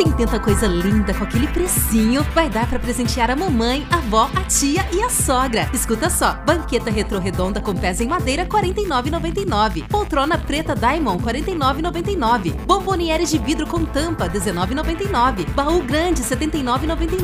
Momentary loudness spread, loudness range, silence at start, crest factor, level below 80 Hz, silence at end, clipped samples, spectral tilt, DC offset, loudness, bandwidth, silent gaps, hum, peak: 4 LU; 2 LU; 0 s; 18 dB; -28 dBFS; 0 s; under 0.1%; -4.5 dB/octave; under 0.1%; -19 LUFS; 16 kHz; none; none; -2 dBFS